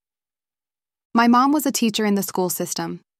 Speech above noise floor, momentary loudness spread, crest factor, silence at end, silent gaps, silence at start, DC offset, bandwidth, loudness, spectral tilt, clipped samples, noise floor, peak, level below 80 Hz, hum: over 71 dB; 9 LU; 18 dB; 0.2 s; none; 1.15 s; under 0.1%; 16 kHz; -20 LUFS; -4 dB/octave; under 0.1%; under -90 dBFS; -4 dBFS; -68 dBFS; none